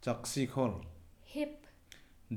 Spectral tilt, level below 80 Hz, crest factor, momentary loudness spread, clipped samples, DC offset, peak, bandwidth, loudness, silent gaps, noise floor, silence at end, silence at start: -5.5 dB/octave; -62 dBFS; 20 dB; 24 LU; under 0.1%; under 0.1%; -18 dBFS; over 20 kHz; -37 LUFS; none; -59 dBFS; 0 s; 0 s